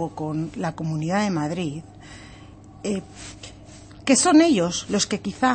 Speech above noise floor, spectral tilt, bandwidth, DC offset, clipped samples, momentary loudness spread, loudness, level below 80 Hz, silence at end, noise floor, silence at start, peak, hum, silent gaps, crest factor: 22 dB; -4 dB/octave; 8.8 kHz; under 0.1%; under 0.1%; 25 LU; -22 LUFS; -52 dBFS; 0 s; -44 dBFS; 0 s; -4 dBFS; none; none; 18 dB